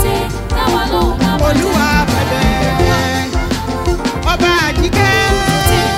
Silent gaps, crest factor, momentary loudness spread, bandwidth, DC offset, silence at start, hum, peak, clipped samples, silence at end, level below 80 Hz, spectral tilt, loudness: none; 14 dB; 6 LU; 16.5 kHz; under 0.1%; 0 s; none; 0 dBFS; under 0.1%; 0 s; -20 dBFS; -5 dB/octave; -13 LUFS